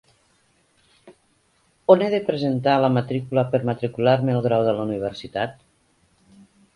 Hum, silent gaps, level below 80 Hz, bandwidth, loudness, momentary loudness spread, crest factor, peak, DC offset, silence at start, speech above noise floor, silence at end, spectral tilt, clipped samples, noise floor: none; none; -60 dBFS; 11 kHz; -21 LUFS; 11 LU; 22 dB; 0 dBFS; under 0.1%; 1.05 s; 43 dB; 1.25 s; -8 dB/octave; under 0.1%; -64 dBFS